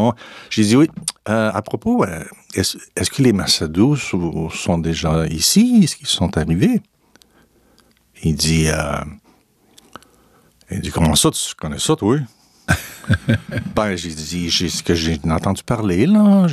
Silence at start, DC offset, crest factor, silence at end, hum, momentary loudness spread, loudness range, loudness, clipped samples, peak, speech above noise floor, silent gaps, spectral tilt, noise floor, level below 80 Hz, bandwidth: 0 s; under 0.1%; 16 dB; 0 s; none; 10 LU; 6 LU; -18 LUFS; under 0.1%; -2 dBFS; 38 dB; none; -4.5 dB/octave; -55 dBFS; -36 dBFS; 14.5 kHz